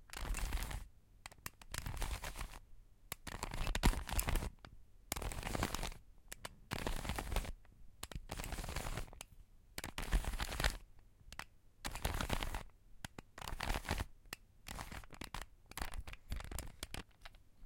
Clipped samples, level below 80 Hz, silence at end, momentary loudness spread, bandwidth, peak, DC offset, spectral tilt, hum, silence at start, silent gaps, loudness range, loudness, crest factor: under 0.1%; -46 dBFS; 0 s; 14 LU; 17 kHz; -14 dBFS; under 0.1%; -3.5 dB/octave; none; 0 s; none; 5 LU; -45 LUFS; 28 dB